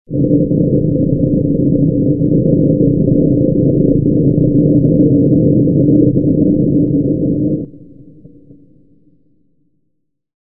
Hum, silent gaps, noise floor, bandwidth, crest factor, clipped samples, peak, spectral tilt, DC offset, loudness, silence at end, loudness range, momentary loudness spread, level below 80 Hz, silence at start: none; none; -69 dBFS; 0.7 kHz; 12 dB; under 0.1%; 0 dBFS; -18.5 dB/octave; 0.8%; -12 LUFS; 2.65 s; 8 LU; 4 LU; -32 dBFS; 0.1 s